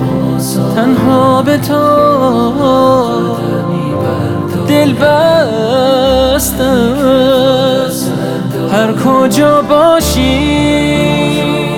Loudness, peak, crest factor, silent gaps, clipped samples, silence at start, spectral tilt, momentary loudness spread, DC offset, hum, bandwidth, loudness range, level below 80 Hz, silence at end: -10 LUFS; 0 dBFS; 10 dB; none; under 0.1%; 0 s; -5.5 dB/octave; 6 LU; under 0.1%; none; 19.5 kHz; 1 LU; -30 dBFS; 0 s